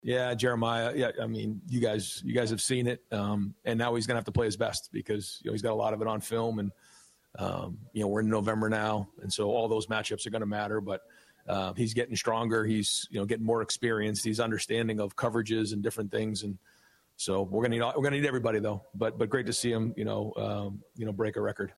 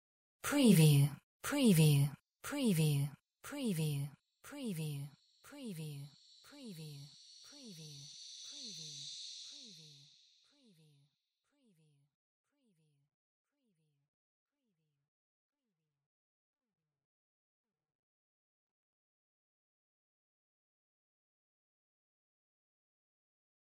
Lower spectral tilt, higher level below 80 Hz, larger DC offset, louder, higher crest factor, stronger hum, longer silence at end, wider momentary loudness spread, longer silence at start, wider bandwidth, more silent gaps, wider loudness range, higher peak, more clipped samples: about the same, -5 dB/octave vs -5.5 dB/octave; first, -62 dBFS vs -76 dBFS; neither; first, -31 LUFS vs -34 LUFS; second, 16 dB vs 24 dB; neither; second, 0.05 s vs 14 s; second, 7 LU vs 25 LU; second, 0.05 s vs 0.45 s; about the same, 15.5 kHz vs 16 kHz; second, none vs 1.23-1.40 s; second, 2 LU vs 19 LU; about the same, -16 dBFS vs -16 dBFS; neither